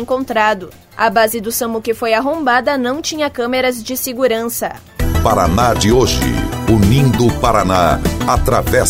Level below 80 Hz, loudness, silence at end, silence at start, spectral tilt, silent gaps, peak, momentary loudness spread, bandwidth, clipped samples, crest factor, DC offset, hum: -26 dBFS; -15 LUFS; 0 s; 0 s; -5 dB/octave; none; 0 dBFS; 7 LU; 16.5 kHz; under 0.1%; 14 dB; under 0.1%; none